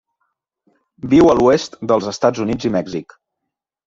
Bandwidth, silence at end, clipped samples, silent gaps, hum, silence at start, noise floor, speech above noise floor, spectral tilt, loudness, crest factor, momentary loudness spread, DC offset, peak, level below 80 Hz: 7.8 kHz; 0.85 s; under 0.1%; none; none; 1.05 s; -80 dBFS; 65 dB; -6 dB/octave; -16 LUFS; 16 dB; 15 LU; under 0.1%; -2 dBFS; -46 dBFS